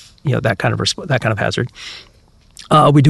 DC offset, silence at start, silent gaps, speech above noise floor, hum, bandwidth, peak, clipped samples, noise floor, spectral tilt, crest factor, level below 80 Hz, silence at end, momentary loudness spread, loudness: under 0.1%; 0.25 s; none; 29 dB; none; 12 kHz; -2 dBFS; under 0.1%; -43 dBFS; -5.5 dB/octave; 14 dB; -44 dBFS; 0 s; 18 LU; -17 LUFS